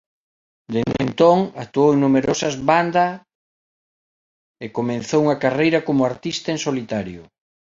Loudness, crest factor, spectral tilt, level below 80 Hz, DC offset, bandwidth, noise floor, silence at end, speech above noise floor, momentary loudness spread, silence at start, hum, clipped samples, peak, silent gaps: -19 LUFS; 18 dB; -5.5 dB/octave; -54 dBFS; under 0.1%; 7.8 kHz; under -90 dBFS; 0.5 s; over 71 dB; 11 LU; 0.7 s; none; under 0.1%; -2 dBFS; 3.35-4.54 s